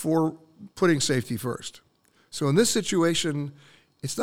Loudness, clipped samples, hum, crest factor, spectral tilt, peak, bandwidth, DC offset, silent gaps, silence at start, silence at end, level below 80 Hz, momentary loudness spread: -25 LUFS; under 0.1%; none; 18 dB; -4.5 dB/octave; -8 dBFS; 17 kHz; under 0.1%; none; 0 s; 0 s; -60 dBFS; 16 LU